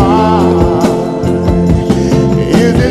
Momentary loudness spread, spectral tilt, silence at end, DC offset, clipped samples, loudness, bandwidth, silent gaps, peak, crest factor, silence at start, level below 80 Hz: 4 LU; -7.5 dB/octave; 0 s; under 0.1%; 0.3%; -10 LUFS; 13 kHz; none; 0 dBFS; 10 dB; 0 s; -22 dBFS